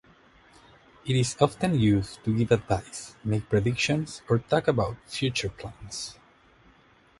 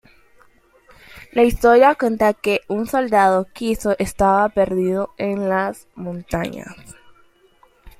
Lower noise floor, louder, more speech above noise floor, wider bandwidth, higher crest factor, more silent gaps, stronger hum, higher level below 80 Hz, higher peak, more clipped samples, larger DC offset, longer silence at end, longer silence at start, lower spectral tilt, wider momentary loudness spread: first, -59 dBFS vs -55 dBFS; second, -27 LUFS vs -18 LUFS; second, 33 dB vs 37 dB; second, 11.5 kHz vs 16 kHz; about the same, 22 dB vs 18 dB; neither; neither; second, -50 dBFS vs -40 dBFS; second, -6 dBFS vs -2 dBFS; neither; neither; first, 1.1 s vs 0.1 s; about the same, 1.05 s vs 1.15 s; about the same, -5.5 dB/octave vs -6 dB/octave; about the same, 12 LU vs 14 LU